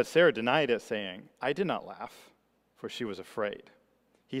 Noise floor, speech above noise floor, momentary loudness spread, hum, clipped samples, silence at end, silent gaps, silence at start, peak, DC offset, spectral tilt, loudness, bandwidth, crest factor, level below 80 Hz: -69 dBFS; 39 dB; 20 LU; none; under 0.1%; 0 s; none; 0 s; -10 dBFS; under 0.1%; -5 dB/octave; -31 LUFS; 15 kHz; 22 dB; -74 dBFS